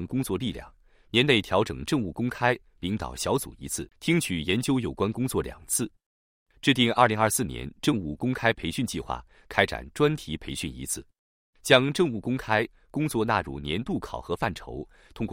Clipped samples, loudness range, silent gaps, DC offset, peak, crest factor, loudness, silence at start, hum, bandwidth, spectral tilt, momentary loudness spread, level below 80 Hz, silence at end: under 0.1%; 3 LU; 6.06-6.46 s, 11.19-11.53 s; under 0.1%; -2 dBFS; 24 dB; -27 LUFS; 0 s; none; 16 kHz; -4.5 dB/octave; 12 LU; -50 dBFS; 0 s